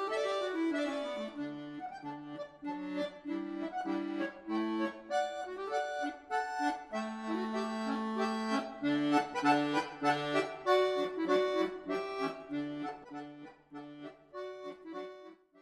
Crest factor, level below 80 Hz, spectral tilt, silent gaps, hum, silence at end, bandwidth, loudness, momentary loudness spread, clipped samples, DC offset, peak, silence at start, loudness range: 20 dB; -74 dBFS; -5 dB/octave; none; none; 0 s; 12.5 kHz; -35 LUFS; 16 LU; under 0.1%; under 0.1%; -16 dBFS; 0 s; 8 LU